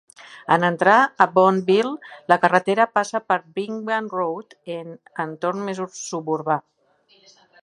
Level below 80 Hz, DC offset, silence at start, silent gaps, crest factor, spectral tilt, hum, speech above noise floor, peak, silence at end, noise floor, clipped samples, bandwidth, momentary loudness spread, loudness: -74 dBFS; under 0.1%; 0.2 s; none; 22 dB; -5 dB/octave; none; 39 dB; 0 dBFS; 1.05 s; -59 dBFS; under 0.1%; 11.5 kHz; 17 LU; -20 LUFS